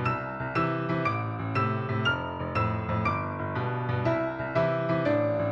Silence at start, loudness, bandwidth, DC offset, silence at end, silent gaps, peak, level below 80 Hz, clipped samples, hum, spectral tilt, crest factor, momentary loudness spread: 0 s; -28 LUFS; 7.2 kHz; under 0.1%; 0 s; none; -14 dBFS; -52 dBFS; under 0.1%; none; -8 dB/octave; 14 dB; 5 LU